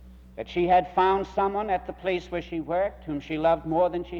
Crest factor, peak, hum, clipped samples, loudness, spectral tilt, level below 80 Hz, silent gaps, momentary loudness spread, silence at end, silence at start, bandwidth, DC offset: 16 dB; -10 dBFS; none; under 0.1%; -26 LUFS; -7 dB/octave; -48 dBFS; none; 10 LU; 0 s; 0 s; 7.4 kHz; under 0.1%